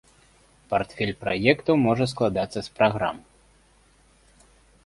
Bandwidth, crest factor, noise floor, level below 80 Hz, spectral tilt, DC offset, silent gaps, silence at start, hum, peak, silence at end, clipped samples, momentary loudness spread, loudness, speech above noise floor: 11.5 kHz; 22 dB; -59 dBFS; -54 dBFS; -6.5 dB/octave; under 0.1%; none; 0.7 s; none; -4 dBFS; 1.7 s; under 0.1%; 8 LU; -24 LUFS; 35 dB